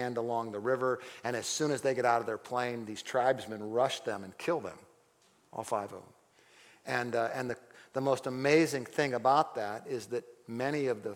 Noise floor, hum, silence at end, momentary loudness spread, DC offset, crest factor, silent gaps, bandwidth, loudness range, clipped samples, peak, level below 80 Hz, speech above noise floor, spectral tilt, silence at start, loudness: -67 dBFS; none; 0 s; 12 LU; under 0.1%; 20 dB; none; 17 kHz; 7 LU; under 0.1%; -12 dBFS; -78 dBFS; 35 dB; -4.5 dB/octave; 0 s; -33 LUFS